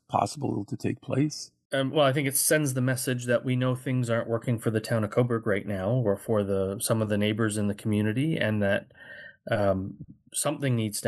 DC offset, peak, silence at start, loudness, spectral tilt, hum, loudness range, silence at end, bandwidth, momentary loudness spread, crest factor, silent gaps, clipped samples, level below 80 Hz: under 0.1%; -8 dBFS; 0.1 s; -27 LUFS; -5 dB/octave; none; 2 LU; 0 s; 12.5 kHz; 8 LU; 18 dB; 1.65-1.70 s; under 0.1%; -66 dBFS